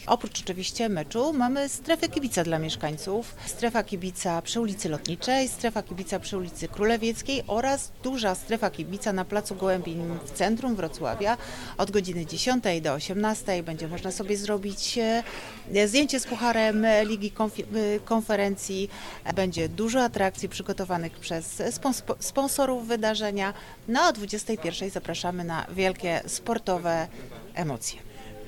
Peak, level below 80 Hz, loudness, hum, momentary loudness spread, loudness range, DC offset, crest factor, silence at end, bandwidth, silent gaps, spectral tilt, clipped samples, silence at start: -6 dBFS; -48 dBFS; -28 LUFS; none; 9 LU; 4 LU; under 0.1%; 22 dB; 0 s; 18.5 kHz; none; -4 dB/octave; under 0.1%; 0 s